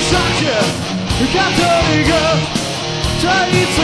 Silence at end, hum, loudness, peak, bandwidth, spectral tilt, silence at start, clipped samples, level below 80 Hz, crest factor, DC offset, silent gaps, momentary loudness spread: 0 s; none; -14 LUFS; 0 dBFS; 11 kHz; -4 dB/octave; 0 s; under 0.1%; -30 dBFS; 14 dB; under 0.1%; none; 6 LU